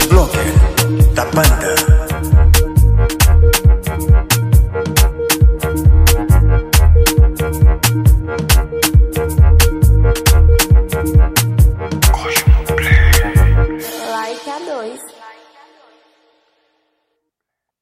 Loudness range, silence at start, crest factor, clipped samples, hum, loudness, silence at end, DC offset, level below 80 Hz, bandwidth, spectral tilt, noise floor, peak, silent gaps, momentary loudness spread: 7 LU; 0 s; 12 dB; under 0.1%; none; -13 LUFS; 2.5 s; under 0.1%; -14 dBFS; 16 kHz; -5 dB/octave; -80 dBFS; 0 dBFS; none; 6 LU